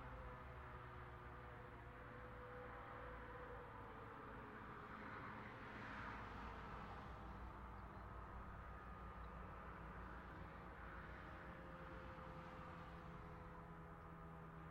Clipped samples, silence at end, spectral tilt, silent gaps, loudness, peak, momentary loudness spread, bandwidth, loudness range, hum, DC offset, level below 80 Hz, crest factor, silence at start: under 0.1%; 0 s; -7 dB/octave; none; -56 LUFS; -40 dBFS; 4 LU; 16 kHz; 2 LU; none; under 0.1%; -62 dBFS; 14 dB; 0 s